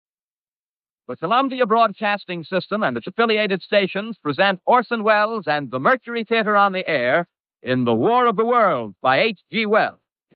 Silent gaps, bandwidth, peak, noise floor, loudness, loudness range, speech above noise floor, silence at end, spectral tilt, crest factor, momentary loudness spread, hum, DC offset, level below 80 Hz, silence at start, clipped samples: 7.40-7.44 s; 5.4 kHz; -4 dBFS; under -90 dBFS; -19 LUFS; 2 LU; over 71 dB; 0.45 s; -2.5 dB/octave; 16 dB; 8 LU; none; under 0.1%; -72 dBFS; 1.1 s; under 0.1%